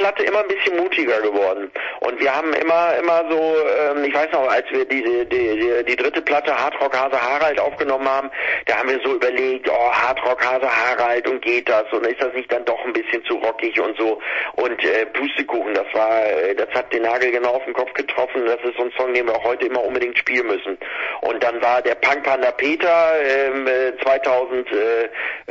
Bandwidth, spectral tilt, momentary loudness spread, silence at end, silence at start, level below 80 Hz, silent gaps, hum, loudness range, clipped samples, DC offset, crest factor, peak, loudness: 7.6 kHz; -4 dB/octave; 5 LU; 0 s; 0 s; -60 dBFS; none; none; 3 LU; under 0.1%; under 0.1%; 16 dB; -4 dBFS; -19 LUFS